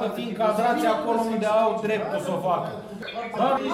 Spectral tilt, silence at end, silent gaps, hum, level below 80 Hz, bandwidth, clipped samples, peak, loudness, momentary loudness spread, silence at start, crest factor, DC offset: -5.5 dB/octave; 0 s; none; none; -62 dBFS; 15.5 kHz; under 0.1%; -10 dBFS; -25 LUFS; 10 LU; 0 s; 14 dB; under 0.1%